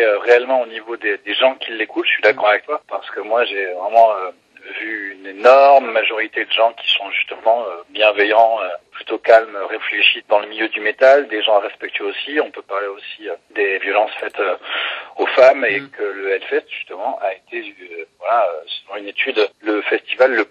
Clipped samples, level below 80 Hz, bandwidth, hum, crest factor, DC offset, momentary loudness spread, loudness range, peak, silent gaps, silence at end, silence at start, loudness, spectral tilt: under 0.1%; -72 dBFS; 7.4 kHz; none; 16 dB; under 0.1%; 15 LU; 6 LU; 0 dBFS; none; 0.05 s; 0 s; -16 LUFS; -3 dB/octave